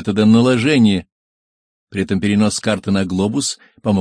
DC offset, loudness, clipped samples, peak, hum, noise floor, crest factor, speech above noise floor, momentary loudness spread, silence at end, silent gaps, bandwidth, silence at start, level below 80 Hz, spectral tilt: under 0.1%; -16 LUFS; under 0.1%; -2 dBFS; none; under -90 dBFS; 14 dB; over 75 dB; 10 LU; 0 s; 1.12-1.87 s; 10.5 kHz; 0 s; -50 dBFS; -5.5 dB/octave